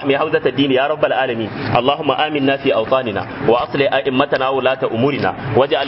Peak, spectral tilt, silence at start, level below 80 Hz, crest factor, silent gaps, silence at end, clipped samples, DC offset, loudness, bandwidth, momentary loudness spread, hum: 0 dBFS; -10 dB/octave; 0 s; -50 dBFS; 16 dB; none; 0 s; under 0.1%; under 0.1%; -17 LUFS; 5.8 kHz; 3 LU; none